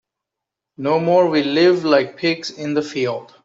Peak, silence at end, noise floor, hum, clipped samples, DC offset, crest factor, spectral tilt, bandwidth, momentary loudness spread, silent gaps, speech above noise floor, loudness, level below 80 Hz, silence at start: -2 dBFS; 0.2 s; -84 dBFS; none; under 0.1%; under 0.1%; 16 dB; -5.5 dB/octave; 7.8 kHz; 8 LU; none; 66 dB; -18 LUFS; -64 dBFS; 0.8 s